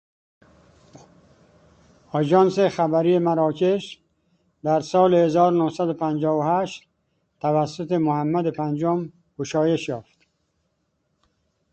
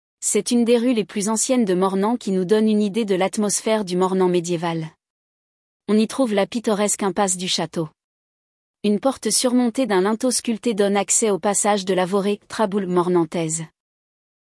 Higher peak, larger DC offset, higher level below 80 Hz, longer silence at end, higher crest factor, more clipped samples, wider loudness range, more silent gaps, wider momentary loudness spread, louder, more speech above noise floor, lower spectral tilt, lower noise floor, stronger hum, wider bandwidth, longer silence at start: about the same, -4 dBFS vs -4 dBFS; neither; about the same, -64 dBFS vs -66 dBFS; first, 1.7 s vs 0.9 s; about the same, 18 dB vs 16 dB; neither; about the same, 4 LU vs 3 LU; second, none vs 5.10-5.80 s, 8.04-8.74 s; first, 12 LU vs 6 LU; about the same, -21 LUFS vs -20 LUFS; second, 51 dB vs over 70 dB; first, -7 dB/octave vs -4 dB/octave; second, -72 dBFS vs under -90 dBFS; neither; second, 8.6 kHz vs 12 kHz; first, 2.15 s vs 0.2 s